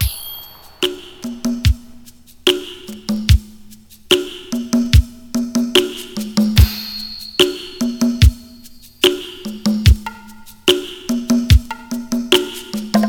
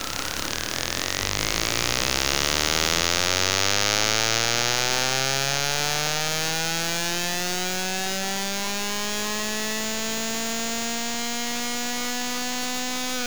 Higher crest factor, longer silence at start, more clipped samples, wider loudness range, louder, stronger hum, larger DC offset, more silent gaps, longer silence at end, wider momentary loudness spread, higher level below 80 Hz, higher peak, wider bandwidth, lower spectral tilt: second, 16 dB vs 24 dB; about the same, 0 s vs 0 s; neither; about the same, 3 LU vs 5 LU; first, -17 LUFS vs -23 LUFS; neither; second, under 0.1% vs 2%; neither; about the same, 0 s vs 0 s; first, 13 LU vs 6 LU; first, -22 dBFS vs -46 dBFS; about the same, 0 dBFS vs -2 dBFS; about the same, over 20 kHz vs over 20 kHz; first, -5 dB/octave vs -1.5 dB/octave